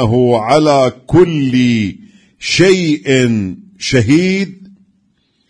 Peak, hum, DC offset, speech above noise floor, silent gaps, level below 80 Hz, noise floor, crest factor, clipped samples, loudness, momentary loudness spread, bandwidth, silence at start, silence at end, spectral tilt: 0 dBFS; none; under 0.1%; 48 dB; none; -42 dBFS; -59 dBFS; 12 dB; under 0.1%; -12 LUFS; 11 LU; 10.5 kHz; 0 s; 0.85 s; -5.5 dB/octave